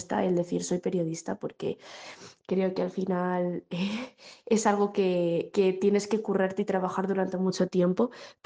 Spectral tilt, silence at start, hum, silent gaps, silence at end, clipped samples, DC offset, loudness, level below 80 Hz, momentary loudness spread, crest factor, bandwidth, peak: -6 dB/octave; 0 s; none; none; 0.15 s; under 0.1%; under 0.1%; -28 LUFS; -72 dBFS; 10 LU; 18 dB; 9.8 kHz; -10 dBFS